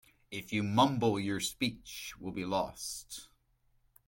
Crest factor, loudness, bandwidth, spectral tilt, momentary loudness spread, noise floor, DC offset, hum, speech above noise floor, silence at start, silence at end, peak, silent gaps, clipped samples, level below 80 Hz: 22 dB; -34 LUFS; 17 kHz; -4.5 dB/octave; 16 LU; -72 dBFS; under 0.1%; none; 38 dB; 0.3 s; 0.8 s; -14 dBFS; none; under 0.1%; -64 dBFS